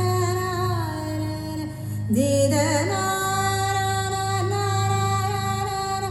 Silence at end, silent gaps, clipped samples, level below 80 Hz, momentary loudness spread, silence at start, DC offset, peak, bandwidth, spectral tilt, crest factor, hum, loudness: 0 s; none; under 0.1%; -48 dBFS; 9 LU; 0 s; under 0.1%; -8 dBFS; 14.5 kHz; -5 dB/octave; 14 dB; none; -24 LUFS